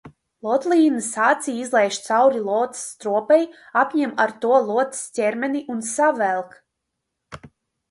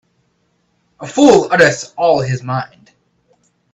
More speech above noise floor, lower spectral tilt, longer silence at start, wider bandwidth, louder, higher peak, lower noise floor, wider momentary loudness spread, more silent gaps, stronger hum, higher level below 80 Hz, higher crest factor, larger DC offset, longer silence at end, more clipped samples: first, 59 dB vs 50 dB; second, -3.5 dB/octave vs -5 dB/octave; second, 0.05 s vs 1 s; first, 11.5 kHz vs 9 kHz; second, -20 LUFS vs -13 LUFS; second, -4 dBFS vs 0 dBFS; first, -79 dBFS vs -62 dBFS; second, 8 LU vs 14 LU; neither; neither; second, -66 dBFS vs -54 dBFS; about the same, 16 dB vs 16 dB; neither; second, 0.45 s vs 1.1 s; neither